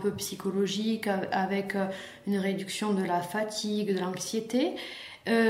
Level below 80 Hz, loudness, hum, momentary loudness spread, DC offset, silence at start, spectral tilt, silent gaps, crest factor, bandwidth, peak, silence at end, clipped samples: -70 dBFS; -31 LUFS; none; 5 LU; under 0.1%; 0 s; -4.5 dB/octave; none; 16 dB; 16 kHz; -14 dBFS; 0 s; under 0.1%